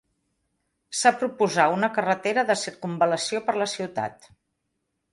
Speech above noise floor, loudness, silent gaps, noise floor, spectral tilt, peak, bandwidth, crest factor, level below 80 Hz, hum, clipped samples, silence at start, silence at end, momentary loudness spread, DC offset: 54 dB; -24 LUFS; none; -78 dBFS; -3.5 dB/octave; -4 dBFS; 11.5 kHz; 20 dB; -70 dBFS; none; under 0.1%; 0.9 s; 1 s; 10 LU; under 0.1%